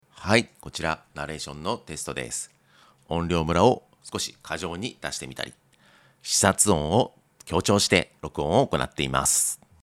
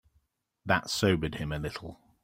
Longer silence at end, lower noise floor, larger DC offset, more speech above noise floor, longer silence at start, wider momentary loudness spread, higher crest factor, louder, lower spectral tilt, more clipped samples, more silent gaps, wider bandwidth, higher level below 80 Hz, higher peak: about the same, 0.3 s vs 0.3 s; second, -58 dBFS vs -73 dBFS; neither; second, 33 dB vs 43 dB; second, 0.15 s vs 0.65 s; second, 14 LU vs 17 LU; about the same, 24 dB vs 24 dB; first, -25 LUFS vs -30 LUFS; second, -3.5 dB/octave vs -5 dB/octave; neither; neither; about the same, 16.5 kHz vs 16 kHz; about the same, -50 dBFS vs -52 dBFS; first, -2 dBFS vs -8 dBFS